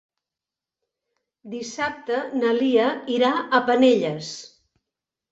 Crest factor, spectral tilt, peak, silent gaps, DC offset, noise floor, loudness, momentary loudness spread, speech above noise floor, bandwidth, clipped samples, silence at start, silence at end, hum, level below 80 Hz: 20 dB; -4.5 dB/octave; -4 dBFS; none; under 0.1%; -89 dBFS; -21 LUFS; 16 LU; 67 dB; 8 kHz; under 0.1%; 1.45 s; 0.85 s; none; -68 dBFS